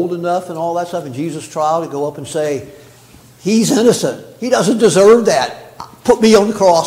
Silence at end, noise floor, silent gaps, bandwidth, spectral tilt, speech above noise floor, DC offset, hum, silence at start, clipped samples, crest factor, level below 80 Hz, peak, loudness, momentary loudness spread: 0 s; -43 dBFS; none; 16 kHz; -4.5 dB/octave; 29 dB; under 0.1%; none; 0 s; under 0.1%; 14 dB; -52 dBFS; 0 dBFS; -14 LUFS; 14 LU